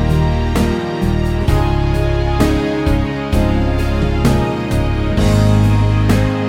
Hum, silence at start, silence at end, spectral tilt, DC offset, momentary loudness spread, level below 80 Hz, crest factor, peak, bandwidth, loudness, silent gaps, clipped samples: none; 0 s; 0 s; -7 dB/octave; under 0.1%; 5 LU; -20 dBFS; 12 dB; -2 dBFS; 16 kHz; -15 LUFS; none; under 0.1%